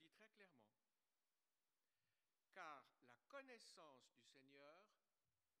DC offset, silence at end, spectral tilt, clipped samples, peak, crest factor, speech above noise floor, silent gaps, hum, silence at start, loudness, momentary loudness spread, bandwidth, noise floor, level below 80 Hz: under 0.1%; 0.65 s; -2.5 dB/octave; under 0.1%; -44 dBFS; 24 dB; over 20 dB; none; none; 0 s; -64 LUFS; 9 LU; 11 kHz; under -90 dBFS; under -90 dBFS